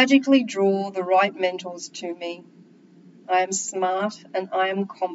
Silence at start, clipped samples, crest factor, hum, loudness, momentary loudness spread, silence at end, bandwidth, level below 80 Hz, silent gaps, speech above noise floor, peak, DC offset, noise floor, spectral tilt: 0 s; under 0.1%; 18 dB; none; -23 LUFS; 14 LU; 0 s; 8 kHz; under -90 dBFS; none; 28 dB; -4 dBFS; under 0.1%; -51 dBFS; -3.5 dB/octave